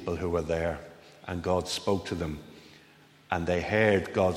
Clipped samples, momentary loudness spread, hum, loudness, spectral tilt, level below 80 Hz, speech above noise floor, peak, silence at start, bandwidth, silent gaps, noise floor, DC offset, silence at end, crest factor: under 0.1%; 18 LU; none; -29 LUFS; -5.5 dB/octave; -50 dBFS; 29 dB; -10 dBFS; 0 s; 16 kHz; none; -57 dBFS; under 0.1%; 0 s; 20 dB